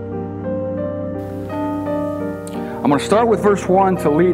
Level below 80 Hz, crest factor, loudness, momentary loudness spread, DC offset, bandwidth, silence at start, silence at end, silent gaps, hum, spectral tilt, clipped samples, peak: -44 dBFS; 16 dB; -19 LUFS; 11 LU; under 0.1%; 16 kHz; 0 s; 0 s; none; none; -7 dB/octave; under 0.1%; -2 dBFS